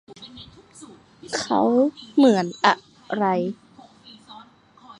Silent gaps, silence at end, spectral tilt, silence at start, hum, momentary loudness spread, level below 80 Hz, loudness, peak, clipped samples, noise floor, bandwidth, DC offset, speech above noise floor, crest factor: none; 0.05 s; -5 dB/octave; 0.1 s; none; 24 LU; -66 dBFS; -21 LUFS; -2 dBFS; under 0.1%; -50 dBFS; 11 kHz; under 0.1%; 30 dB; 22 dB